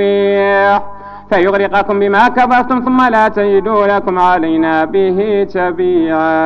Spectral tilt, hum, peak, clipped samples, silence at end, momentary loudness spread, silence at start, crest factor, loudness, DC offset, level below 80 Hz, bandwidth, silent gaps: -7 dB/octave; 50 Hz at -35 dBFS; 0 dBFS; under 0.1%; 0 s; 4 LU; 0 s; 12 dB; -12 LUFS; under 0.1%; -44 dBFS; 6.8 kHz; none